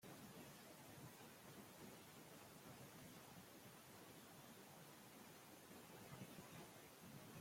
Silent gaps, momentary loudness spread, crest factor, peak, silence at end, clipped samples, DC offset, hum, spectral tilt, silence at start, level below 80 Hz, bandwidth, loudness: none; 3 LU; 16 dB; -44 dBFS; 0 s; under 0.1%; under 0.1%; none; -4 dB/octave; 0 s; -86 dBFS; 16.5 kHz; -61 LUFS